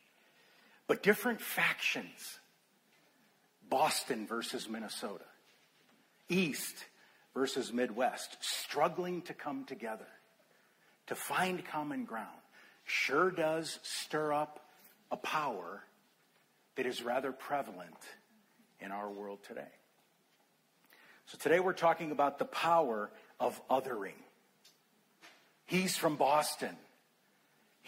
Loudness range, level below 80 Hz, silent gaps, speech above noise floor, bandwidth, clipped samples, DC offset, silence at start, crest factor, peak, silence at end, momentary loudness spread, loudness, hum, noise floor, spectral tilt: 7 LU; -84 dBFS; none; 37 dB; 16 kHz; under 0.1%; under 0.1%; 0.9 s; 24 dB; -14 dBFS; 1.05 s; 18 LU; -35 LUFS; none; -72 dBFS; -3.5 dB/octave